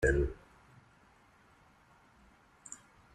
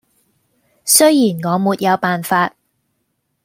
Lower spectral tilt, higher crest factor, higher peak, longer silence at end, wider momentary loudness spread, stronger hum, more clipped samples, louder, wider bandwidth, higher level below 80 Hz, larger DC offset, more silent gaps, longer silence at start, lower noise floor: first, -6.5 dB/octave vs -3.5 dB/octave; first, 24 dB vs 18 dB; second, -16 dBFS vs 0 dBFS; second, 0.4 s vs 0.95 s; first, 29 LU vs 8 LU; neither; neither; second, -37 LUFS vs -14 LUFS; second, 11 kHz vs 16.5 kHz; first, -44 dBFS vs -66 dBFS; neither; neither; second, 0 s vs 0.85 s; second, -64 dBFS vs -69 dBFS